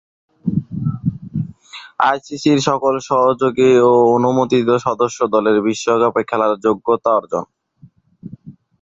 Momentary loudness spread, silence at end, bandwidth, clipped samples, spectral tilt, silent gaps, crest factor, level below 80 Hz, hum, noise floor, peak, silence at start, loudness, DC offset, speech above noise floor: 13 LU; 0.3 s; 7.8 kHz; under 0.1%; -6 dB/octave; none; 16 dB; -52 dBFS; none; -49 dBFS; 0 dBFS; 0.45 s; -16 LUFS; under 0.1%; 34 dB